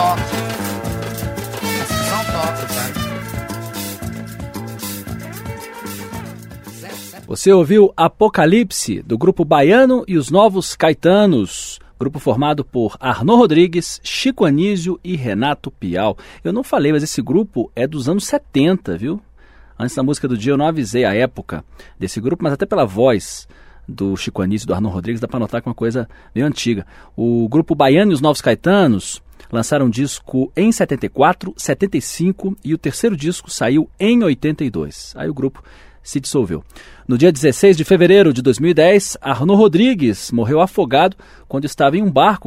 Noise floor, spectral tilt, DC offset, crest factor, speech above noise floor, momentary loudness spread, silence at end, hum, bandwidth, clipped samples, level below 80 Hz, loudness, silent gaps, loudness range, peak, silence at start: -44 dBFS; -5.5 dB/octave; under 0.1%; 16 dB; 29 dB; 16 LU; 0 s; none; 16 kHz; under 0.1%; -44 dBFS; -16 LUFS; none; 9 LU; 0 dBFS; 0 s